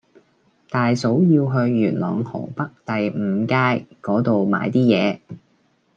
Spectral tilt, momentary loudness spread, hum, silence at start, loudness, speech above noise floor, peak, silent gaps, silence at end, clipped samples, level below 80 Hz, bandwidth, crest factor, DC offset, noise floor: -7.5 dB/octave; 10 LU; none; 0.7 s; -20 LUFS; 43 dB; -4 dBFS; none; 0.6 s; under 0.1%; -64 dBFS; 7.8 kHz; 16 dB; under 0.1%; -62 dBFS